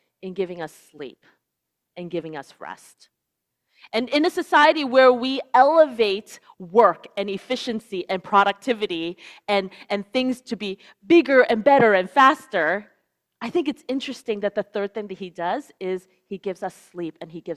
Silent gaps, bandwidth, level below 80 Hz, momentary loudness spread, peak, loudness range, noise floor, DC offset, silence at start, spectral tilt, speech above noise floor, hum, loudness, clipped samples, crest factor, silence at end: none; 13 kHz; -70 dBFS; 20 LU; -2 dBFS; 11 LU; -80 dBFS; under 0.1%; 0.25 s; -5 dB/octave; 59 dB; none; -21 LUFS; under 0.1%; 20 dB; 0 s